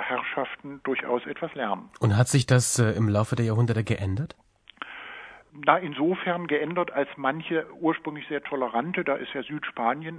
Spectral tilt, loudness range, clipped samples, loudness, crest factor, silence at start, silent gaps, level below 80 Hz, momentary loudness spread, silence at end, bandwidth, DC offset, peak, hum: -5.5 dB/octave; 4 LU; under 0.1%; -26 LUFS; 22 dB; 0 s; none; -60 dBFS; 12 LU; 0 s; 11 kHz; under 0.1%; -4 dBFS; none